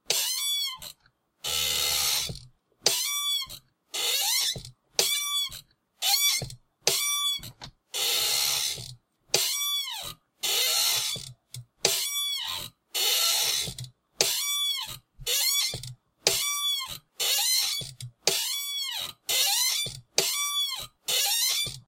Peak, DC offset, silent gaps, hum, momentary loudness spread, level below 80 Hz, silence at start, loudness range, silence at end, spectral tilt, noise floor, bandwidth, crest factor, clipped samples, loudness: -2 dBFS; under 0.1%; none; none; 15 LU; -60 dBFS; 0.1 s; 2 LU; 0.05 s; 0.5 dB/octave; -67 dBFS; 16 kHz; 26 dB; under 0.1%; -25 LUFS